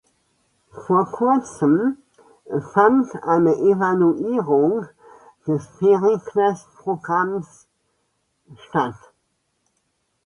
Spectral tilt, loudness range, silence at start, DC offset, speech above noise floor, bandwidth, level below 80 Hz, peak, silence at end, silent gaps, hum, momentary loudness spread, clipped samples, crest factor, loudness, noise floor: -8 dB/octave; 8 LU; 0.75 s; under 0.1%; 52 dB; 10.5 kHz; -64 dBFS; -2 dBFS; 1.35 s; none; none; 12 LU; under 0.1%; 18 dB; -20 LUFS; -71 dBFS